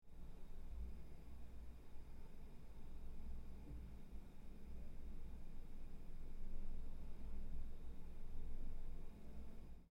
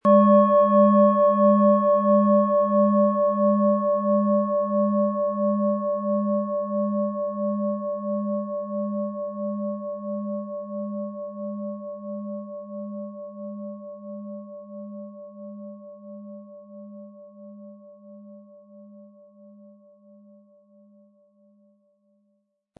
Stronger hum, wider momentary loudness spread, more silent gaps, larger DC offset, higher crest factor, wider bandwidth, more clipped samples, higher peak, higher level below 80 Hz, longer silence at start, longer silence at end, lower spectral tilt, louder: neither; second, 6 LU vs 23 LU; neither; neither; second, 12 dB vs 18 dB; first, 3.9 kHz vs 3.5 kHz; neither; second, -34 dBFS vs -6 dBFS; first, -50 dBFS vs -88 dBFS; about the same, 0.05 s vs 0.05 s; second, 0.05 s vs 3.75 s; second, -7.5 dB/octave vs -12.5 dB/octave; second, -58 LUFS vs -22 LUFS